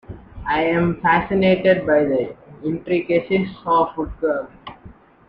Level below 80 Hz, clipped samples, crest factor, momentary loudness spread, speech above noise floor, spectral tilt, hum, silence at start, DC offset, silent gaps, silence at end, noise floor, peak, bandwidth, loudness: -44 dBFS; under 0.1%; 16 dB; 15 LU; 26 dB; -9.5 dB/octave; none; 0.1 s; under 0.1%; none; 0.35 s; -45 dBFS; -4 dBFS; 5.4 kHz; -19 LUFS